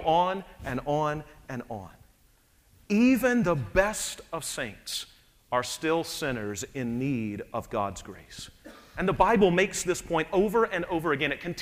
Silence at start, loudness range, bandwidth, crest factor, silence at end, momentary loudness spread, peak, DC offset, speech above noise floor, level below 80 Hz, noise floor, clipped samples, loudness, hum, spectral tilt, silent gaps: 0 s; 5 LU; 15.5 kHz; 20 dB; 0 s; 17 LU; -8 dBFS; under 0.1%; 35 dB; -50 dBFS; -62 dBFS; under 0.1%; -28 LUFS; none; -4.5 dB/octave; none